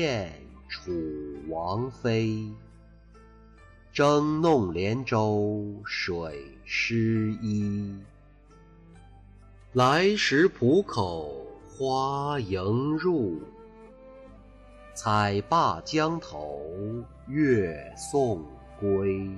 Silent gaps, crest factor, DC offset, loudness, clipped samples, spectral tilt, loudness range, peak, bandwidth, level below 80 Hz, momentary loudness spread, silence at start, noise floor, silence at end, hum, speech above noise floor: none; 16 dB; under 0.1%; -27 LUFS; under 0.1%; -6 dB/octave; 5 LU; -12 dBFS; 12 kHz; -54 dBFS; 16 LU; 0 s; -53 dBFS; 0 s; none; 27 dB